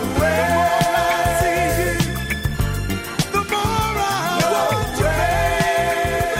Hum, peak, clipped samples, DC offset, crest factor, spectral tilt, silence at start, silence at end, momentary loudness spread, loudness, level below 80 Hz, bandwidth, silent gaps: none; -6 dBFS; under 0.1%; under 0.1%; 14 dB; -4.5 dB/octave; 0 s; 0 s; 5 LU; -19 LUFS; -32 dBFS; 16 kHz; none